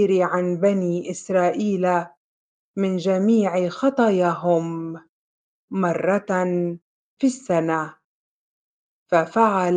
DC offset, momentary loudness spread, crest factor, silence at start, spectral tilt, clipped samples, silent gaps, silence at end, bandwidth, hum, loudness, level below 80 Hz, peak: under 0.1%; 11 LU; 18 dB; 0 s; -7 dB/octave; under 0.1%; 2.17-2.74 s, 5.09-5.68 s, 6.82-7.17 s, 8.04-9.06 s; 0 s; 9.4 kHz; none; -21 LUFS; -70 dBFS; -4 dBFS